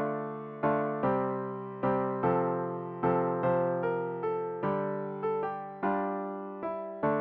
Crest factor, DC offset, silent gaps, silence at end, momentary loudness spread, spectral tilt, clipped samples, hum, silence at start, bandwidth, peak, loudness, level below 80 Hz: 16 dB; under 0.1%; none; 0 s; 8 LU; -7.5 dB/octave; under 0.1%; none; 0 s; 4.6 kHz; -14 dBFS; -32 LUFS; -66 dBFS